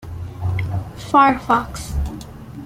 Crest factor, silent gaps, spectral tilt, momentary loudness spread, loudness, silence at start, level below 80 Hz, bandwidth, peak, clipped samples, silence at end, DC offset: 18 dB; none; -6 dB/octave; 18 LU; -19 LUFS; 0 s; -32 dBFS; 16 kHz; -2 dBFS; under 0.1%; 0 s; under 0.1%